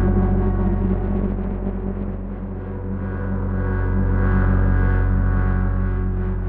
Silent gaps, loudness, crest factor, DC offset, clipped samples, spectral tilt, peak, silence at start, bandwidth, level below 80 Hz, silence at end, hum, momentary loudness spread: none; -22 LUFS; 12 dB; under 0.1%; under 0.1%; -12.5 dB/octave; -8 dBFS; 0 s; 3 kHz; -22 dBFS; 0 s; none; 9 LU